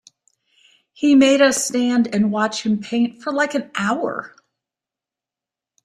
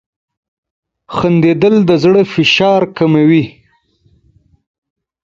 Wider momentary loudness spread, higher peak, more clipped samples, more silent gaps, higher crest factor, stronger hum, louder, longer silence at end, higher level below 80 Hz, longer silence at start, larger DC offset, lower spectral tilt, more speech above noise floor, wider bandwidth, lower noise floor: first, 9 LU vs 6 LU; second, -4 dBFS vs 0 dBFS; neither; neither; about the same, 16 dB vs 14 dB; neither; second, -18 LUFS vs -10 LUFS; second, 1.6 s vs 1.8 s; second, -64 dBFS vs -50 dBFS; about the same, 1 s vs 1.1 s; neither; second, -4 dB/octave vs -6.5 dB/octave; first, 70 dB vs 44 dB; first, 14.5 kHz vs 7.4 kHz; first, -88 dBFS vs -54 dBFS